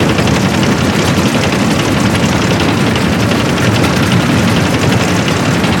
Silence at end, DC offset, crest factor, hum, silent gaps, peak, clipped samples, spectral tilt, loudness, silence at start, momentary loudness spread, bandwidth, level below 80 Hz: 0 s; under 0.1%; 10 dB; none; none; 0 dBFS; under 0.1%; -5 dB/octave; -11 LUFS; 0 s; 1 LU; 18.5 kHz; -30 dBFS